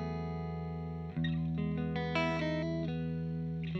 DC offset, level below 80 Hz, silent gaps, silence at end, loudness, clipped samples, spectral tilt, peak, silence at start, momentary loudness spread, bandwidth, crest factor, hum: under 0.1%; -52 dBFS; none; 0 s; -36 LUFS; under 0.1%; -8 dB/octave; -18 dBFS; 0 s; 7 LU; 6.4 kHz; 16 dB; none